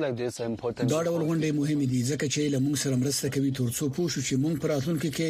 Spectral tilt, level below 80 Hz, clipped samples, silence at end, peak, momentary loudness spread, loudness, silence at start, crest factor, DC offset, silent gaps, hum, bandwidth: -5.5 dB/octave; -58 dBFS; under 0.1%; 0 s; -14 dBFS; 3 LU; -27 LUFS; 0 s; 12 dB; under 0.1%; none; none; 15.5 kHz